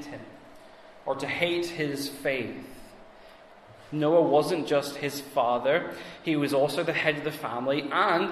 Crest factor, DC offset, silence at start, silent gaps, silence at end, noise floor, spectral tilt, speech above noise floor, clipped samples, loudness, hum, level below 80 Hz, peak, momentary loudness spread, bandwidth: 20 dB; under 0.1%; 0 s; none; 0 s; -51 dBFS; -5 dB/octave; 24 dB; under 0.1%; -27 LUFS; none; -64 dBFS; -8 dBFS; 14 LU; 14 kHz